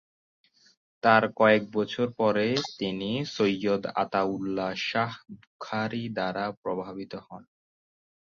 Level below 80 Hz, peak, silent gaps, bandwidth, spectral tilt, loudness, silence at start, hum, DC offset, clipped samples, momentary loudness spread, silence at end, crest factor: -66 dBFS; -6 dBFS; 5.47-5.59 s, 6.57-6.63 s; 7.4 kHz; -5.5 dB/octave; -27 LUFS; 1.05 s; none; under 0.1%; under 0.1%; 15 LU; 0.9 s; 24 dB